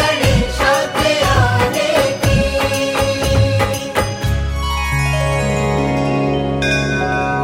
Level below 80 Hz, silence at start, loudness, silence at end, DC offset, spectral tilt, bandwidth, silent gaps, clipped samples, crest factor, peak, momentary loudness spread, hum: -26 dBFS; 0 s; -16 LUFS; 0 s; under 0.1%; -5 dB/octave; 16.5 kHz; none; under 0.1%; 14 dB; 0 dBFS; 5 LU; none